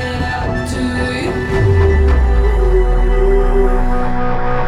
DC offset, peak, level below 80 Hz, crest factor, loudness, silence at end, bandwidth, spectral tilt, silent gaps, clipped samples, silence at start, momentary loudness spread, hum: under 0.1%; -2 dBFS; -14 dBFS; 12 dB; -15 LUFS; 0 s; 11 kHz; -7 dB/octave; none; under 0.1%; 0 s; 6 LU; none